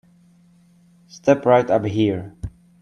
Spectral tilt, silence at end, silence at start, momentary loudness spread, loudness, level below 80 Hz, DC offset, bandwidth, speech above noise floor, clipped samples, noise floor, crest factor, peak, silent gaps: -7 dB/octave; 0.35 s; 1.15 s; 20 LU; -19 LUFS; -48 dBFS; under 0.1%; 10.5 kHz; 36 dB; under 0.1%; -54 dBFS; 20 dB; -2 dBFS; none